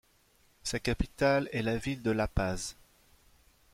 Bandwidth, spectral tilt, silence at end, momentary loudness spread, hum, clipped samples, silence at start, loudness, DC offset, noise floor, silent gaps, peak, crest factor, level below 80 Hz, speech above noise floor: 16 kHz; -5 dB/octave; 1 s; 10 LU; none; under 0.1%; 0.65 s; -32 LUFS; under 0.1%; -66 dBFS; none; -14 dBFS; 20 dB; -44 dBFS; 36 dB